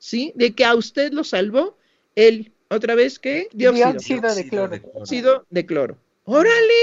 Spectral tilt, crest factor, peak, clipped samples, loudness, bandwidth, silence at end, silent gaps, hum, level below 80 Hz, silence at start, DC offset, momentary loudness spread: -4.5 dB/octave; 16 dB; -2 dBFS; under 0.1%; -19 LUFS; 7.8 kHz; 0 s; none; none; -66 dBFS; 0.05 s; under 0.1%; 12 LU